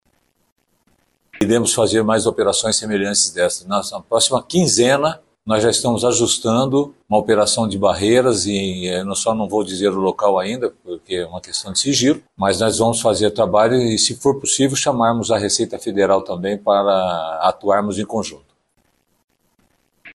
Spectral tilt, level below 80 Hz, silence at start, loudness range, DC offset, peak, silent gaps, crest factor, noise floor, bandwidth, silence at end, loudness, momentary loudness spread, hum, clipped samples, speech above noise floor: -3.5 dB/octave; -52 dBFS; 1.35 s; 3 LU; under 0.1%; -4 dBFS; 19.24-19.28 s; 16 dB; -64 dBFS; 12.5 kHz; 0.05 s; -17 LUFS; 8 LU; none; under 0.1%; 47 dB